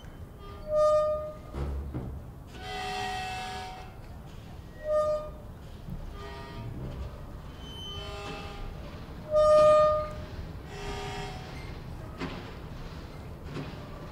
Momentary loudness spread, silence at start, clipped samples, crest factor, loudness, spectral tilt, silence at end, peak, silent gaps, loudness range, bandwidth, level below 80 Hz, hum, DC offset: 20 LU; 0 s; under 0.1%; 20 dB; -30 LUFS; -5.5 dB/octave; 0 s; -12 dBFS; none; 14 LU; 15.5 kHz; -44 dBFS; none; under 0.1%